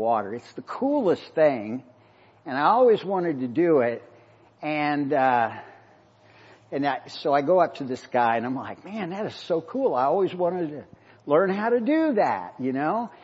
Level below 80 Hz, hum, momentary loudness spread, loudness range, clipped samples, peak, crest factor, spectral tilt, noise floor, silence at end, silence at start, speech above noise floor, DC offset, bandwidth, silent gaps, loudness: -76 dBFS; none; 14 LU; 3 LU; under 0.1%; -8 dBFS; 18 dB; -7.5 dB/octave; -56 dBFS; 0.1 s; 0 s; 32 dB; under 0.1%; 8 kHz; none; -24 LUFS